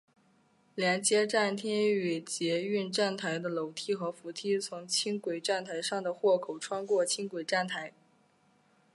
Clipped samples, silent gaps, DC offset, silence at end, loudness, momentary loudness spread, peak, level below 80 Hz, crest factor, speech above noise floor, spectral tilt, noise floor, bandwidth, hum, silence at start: under 0.1%; none; under 0.1%; 1.05 s; -31 LUFS; 8 LU; -12 dBFS; -86 dBFS; 20 dB; 36 dB; -3 dB/octave; -68 dBFS; 11.5 kHz; none; 0.75 s